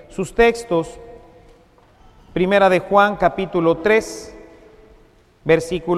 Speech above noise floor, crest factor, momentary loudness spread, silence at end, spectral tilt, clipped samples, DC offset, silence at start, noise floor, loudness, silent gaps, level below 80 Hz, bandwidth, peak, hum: 34 dB; 20 dB; 16 LU; 0 s; -5.5 dB/octave; under 0.1%; under 0.1%; 0.1 s; -51 dBFS; -17 LUFS; none; -42 dBFS; 13.5 kHz; 0 dBFS; none